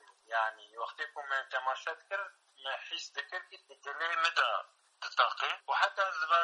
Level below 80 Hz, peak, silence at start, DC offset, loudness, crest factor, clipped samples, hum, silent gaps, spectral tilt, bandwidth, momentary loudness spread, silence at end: under -90 dBFS; -12 dBFS; 0.3 s; under 0.1%; -34 LUFS; 22 dB; under 0.1%; none; none; 3 dB/octave; 11 kHz; 14 LU; 0 s